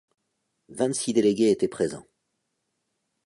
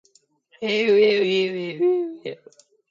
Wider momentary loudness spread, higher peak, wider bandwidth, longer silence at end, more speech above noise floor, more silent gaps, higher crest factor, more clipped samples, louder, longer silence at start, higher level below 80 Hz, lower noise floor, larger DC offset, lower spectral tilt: about the same, 15 LU vs 15 LU; about the same, -10 dBFS vs -8 dBFS; first, 11.5 kHz vs 7.6 kHz; first, 1.25 s vs 0.55 s; first, 54 dB vs 40 dB; neither; about the same, 18 dB vs 14 dB; neither; second, -24 LUFS vs -21 LUFS; about the same, 0.7 s vs 0.6 s; first, -66 dBFS vs -74 dBFS; first, -78 dBFS vs -61 dBFS; neither; about the same, -5 dB/octave vs -5.5 dB/octave